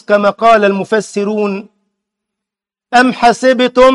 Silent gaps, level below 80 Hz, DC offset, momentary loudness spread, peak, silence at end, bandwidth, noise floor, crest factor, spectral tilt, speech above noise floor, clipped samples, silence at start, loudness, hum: none; -46 dBFS; under 0.1%; 8 LU; 0 dBFS; 0 s; 11.5 kHz; -84 dBFS; 12 dB; -4.5 dB/octave; 73 dB; under 0.1%; 0.1 s; -11 LUFS; none